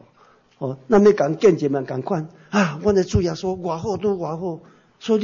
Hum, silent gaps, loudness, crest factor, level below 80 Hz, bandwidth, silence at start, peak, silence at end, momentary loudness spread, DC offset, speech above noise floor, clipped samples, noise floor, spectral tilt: none; none; -21 LUFS; 16 dB; -44 dBFS; 7.4 kHz; 0.6 s; -4 dBFS; 0 s; 15 LU; under 0.1%; 35 dB; under 0.1%; -55 dBFS; -6.5 dB/octave